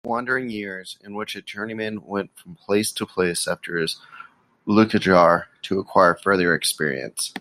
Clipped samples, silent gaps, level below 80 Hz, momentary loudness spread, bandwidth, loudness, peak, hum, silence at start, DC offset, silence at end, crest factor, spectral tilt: under 0.1%; none; -62 dBFS; 15 LU; 16 kHz; -22 LUFS; -2 dBFS; none; 0.05 s; under 0.1%; 0 s; 20 dB; -4 dB/octave